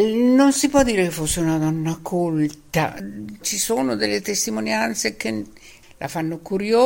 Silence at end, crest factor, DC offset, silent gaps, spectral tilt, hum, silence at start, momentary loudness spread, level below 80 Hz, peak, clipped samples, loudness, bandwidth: 0 s; 18 dB; under 0.1%; none; -4 dB/octave; none; 0 s; 12 LU; -46 dBFS; -4 dBFS; under 0.1%; -21 LUFS; 17 kHz